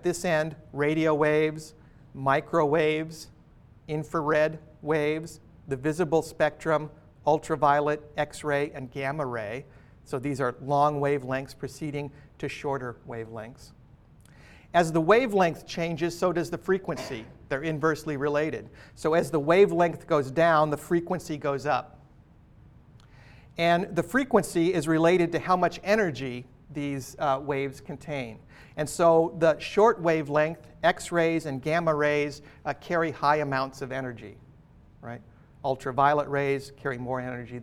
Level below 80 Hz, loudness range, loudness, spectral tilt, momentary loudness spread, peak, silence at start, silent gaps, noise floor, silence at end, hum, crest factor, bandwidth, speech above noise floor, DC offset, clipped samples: -56 dBFS; 5 LU; -27 LUFS; -6 dB/octave; 15 LU; -6 dBFS; 0 s; none; -55 dBFS; 0 s; none; 20 dB; 16 kHz; 28 dB; under 0.1%; under 0.1%